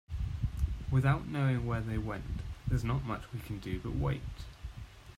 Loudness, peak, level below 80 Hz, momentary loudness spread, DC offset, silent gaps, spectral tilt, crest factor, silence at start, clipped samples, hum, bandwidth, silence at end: -35 LUFS; -16 dBFS; -42 dBFS; 15 LU; under 0.1%; none; -7.5 dB/octave; 18 dB; 0.1 s; under 0.1%; none; 14 kHz; 0 s